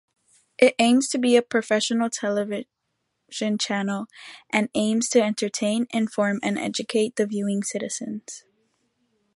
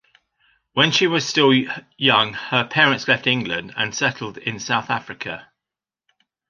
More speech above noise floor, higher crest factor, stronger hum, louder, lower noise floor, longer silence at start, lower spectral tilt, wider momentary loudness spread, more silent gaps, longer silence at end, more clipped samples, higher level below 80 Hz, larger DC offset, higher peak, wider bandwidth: second, 54 dB vs 68 dB; about the same, 22 dB vs 20 dB; neither; second, -23 LUFS vs -19 LUFS; second, -77 dBFS vs -88 dBFS; second, 0.6 s vs 0.75 s; about the same, -4 dB/octave vs -3.5 dB/octave; about the same, 13 LU vs 12 LU; neither; second, 0.95 s vs 1.1 s; neither; second, -72 dBFS vs -62 dBFS; neither; about the same, -2 dBFS vs 0 dBFS; first, 11.5 kHz vs 9.6 kHz